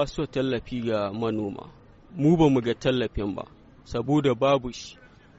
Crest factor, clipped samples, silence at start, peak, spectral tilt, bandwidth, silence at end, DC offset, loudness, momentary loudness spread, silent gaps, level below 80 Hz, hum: 18 dB; under 0.1%; 0 s; -8 dBFS; -6 dB/octave; 8 kHz; 0.35 s; under 0.1%; -25 LUFS; 18 LU; none; -46 dBFS; none